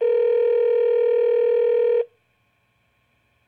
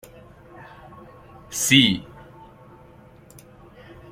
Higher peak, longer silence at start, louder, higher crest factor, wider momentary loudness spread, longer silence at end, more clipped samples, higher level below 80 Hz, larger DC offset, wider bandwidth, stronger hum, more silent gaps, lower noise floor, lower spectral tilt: second, -12 dBFS vs -2 dBFS; second, 0 s vs 0.6 s; about the same, -19 LUFS vs -18 LUFS; second, 8 dB vs 24 dB; second, 3 LU vs 29 LU; second, 1.45 s vs 2.15 s; neither; second, -78 dBFS vs -56 dBFS; neither; second, 4.2 kHz vs 16.5 kHz; neither; neither; first, -66 dBFS vs -48 dBFS; first, -5 dB/octave vs -2.5 dB/octave